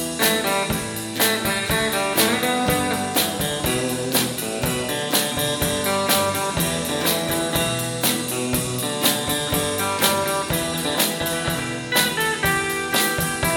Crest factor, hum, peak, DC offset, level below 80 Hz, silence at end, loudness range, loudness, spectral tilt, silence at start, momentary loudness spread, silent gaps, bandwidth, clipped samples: 20 dB; none; -2 dBFS; under 0.1%; -44 dBFS; 0 s; 1 LU; -21 LUFS; -3 dB/octave; 0 s; 4 LU; none; 17.5 kHz; under 0.1%